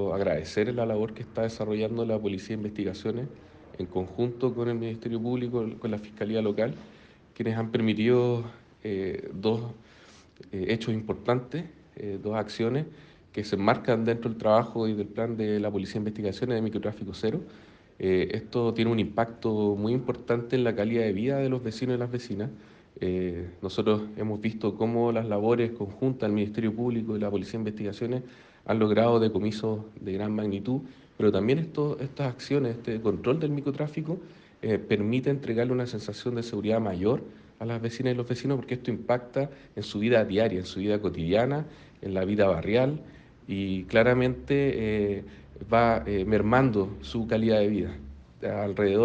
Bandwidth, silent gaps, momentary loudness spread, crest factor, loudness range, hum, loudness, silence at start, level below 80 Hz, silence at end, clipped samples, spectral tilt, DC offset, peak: 8.6 kHz; none; 11 LU; 20 dB; 5 LU; none; -28 LUFS; 0 s; -56 dBFS; 0 s; under 0.1%; -7.5 dB/octave; under 0.1%; -8 dBFS